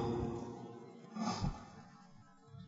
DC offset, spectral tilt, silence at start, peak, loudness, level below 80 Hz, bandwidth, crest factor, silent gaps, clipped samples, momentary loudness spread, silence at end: under 0.1%; -6.5 dB/octave; 0 s; -24 dBFS; -43 LUFS; -54 dBFS; 7.6 kHz; 18 dB; none; under 0.1%; 21 LU; 0 s